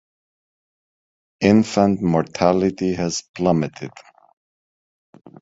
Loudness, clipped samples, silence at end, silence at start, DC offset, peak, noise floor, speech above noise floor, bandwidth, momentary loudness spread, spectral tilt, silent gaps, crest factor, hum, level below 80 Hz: -19 LUFS; under 0.1%; 1.55 s; 1.4 s; under 0.1%; -2 dBFS; under -90 dBFS; over 71 dB; 7.8 kHz; 10 LU; -6 dB/octave; 3.29-3.34 s; 20 dB; none; -50 dBFS